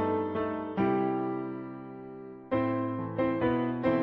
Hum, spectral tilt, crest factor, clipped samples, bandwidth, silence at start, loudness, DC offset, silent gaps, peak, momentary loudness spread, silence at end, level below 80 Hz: none; -10 dB/octave; 16 dB; under 0.1%; 5.2 kHz; 0 s; -31 LUFS; under 0.1%; none; -14 dBFS; 15 LU; 0 s; -60 dBFS